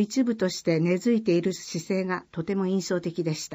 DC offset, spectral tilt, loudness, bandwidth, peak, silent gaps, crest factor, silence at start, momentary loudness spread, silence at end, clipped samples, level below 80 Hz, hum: under 0.1%; -6 dB/octave; -26 LUFS; 15.5 kHz; -12 dBFS; none; 14 dB; 0 s; 7 LU; 0 s; under 0.1%; -66 dBFS; none